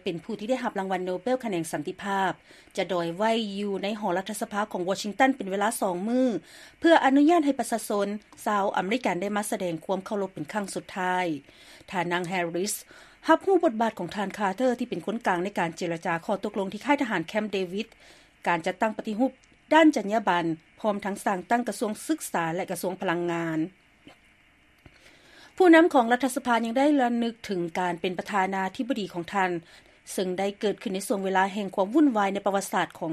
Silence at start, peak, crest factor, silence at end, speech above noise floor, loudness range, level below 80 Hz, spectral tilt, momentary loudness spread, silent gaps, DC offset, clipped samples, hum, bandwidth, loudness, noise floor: 0.05 s; -6 dBFS; 20 dB; 0 s; 34 dB; 6 LU; -68 dBFS; -4.5 dB/octave; 10 LU; none; under 0.1%; under 0.1%; none; 14 kHz; -26 LUFS; -60 dBFS